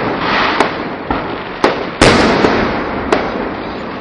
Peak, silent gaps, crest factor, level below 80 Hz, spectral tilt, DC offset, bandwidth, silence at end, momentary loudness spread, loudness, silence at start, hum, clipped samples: 0 dBFS; none; 14 dB; -32 dBFS; -4.5 dB/octave; under 0.1%; 11.5 kHz; 0 s; 12 LU; -14 LUFS; 0 s; none; under 0.1%